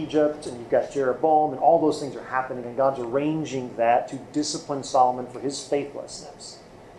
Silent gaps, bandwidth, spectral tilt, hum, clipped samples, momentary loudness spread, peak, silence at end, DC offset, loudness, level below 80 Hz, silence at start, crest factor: none; 11.5 kHz; -5 dB/octave; none; under 0.1%; 15 LU; -6 dBFS; 0 s; under 0.1%; -24 LUFS; -60 dBFS; 0 s; 20 dB